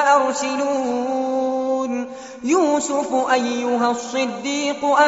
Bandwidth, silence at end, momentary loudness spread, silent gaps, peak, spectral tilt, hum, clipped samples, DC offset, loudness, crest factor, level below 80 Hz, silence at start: 8 kHz; 0 s; 6 LU; none; -2 dBFS; -1.5 dB/octave; none; under 0.1%; under 0.1%; -20 LUFS; 16 dB; -64 dBFS; 0 s